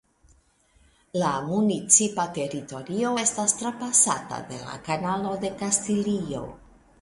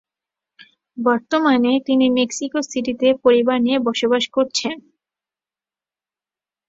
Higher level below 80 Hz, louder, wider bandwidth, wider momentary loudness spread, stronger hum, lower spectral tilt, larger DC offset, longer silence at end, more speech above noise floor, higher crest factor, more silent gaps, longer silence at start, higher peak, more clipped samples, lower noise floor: about the same, -58 dBFS vs -62 dBFS; second, -24 LUFS vs -18 LUFS; first, 11.5 kHz vs 7.8 kHz; first, 17 LU vs 8 LU; neither; about the same, -3.5 dB/octave vs -3.5 dB/octave; neither; second, 0.45 s vs 1.9 s; second, 36 dB vs over 72 dB; about the same, 22 dB vs 18 dB; neither; first, 1.15 s vs 0.95 s; about the same, -4 dBFS vs -2 dBFS; neither; second, -62 dBFS vs under -90 dBFS